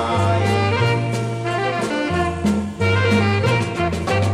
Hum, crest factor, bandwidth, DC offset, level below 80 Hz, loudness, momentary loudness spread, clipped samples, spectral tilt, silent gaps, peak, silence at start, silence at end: none; 14 dB; 12 kHz; under 0.1%; -42 dBFS; -19 LUFS; 5 LU; under 0.1%; -6 dB/octave; none; -4 dBFS; 0 s; 0 s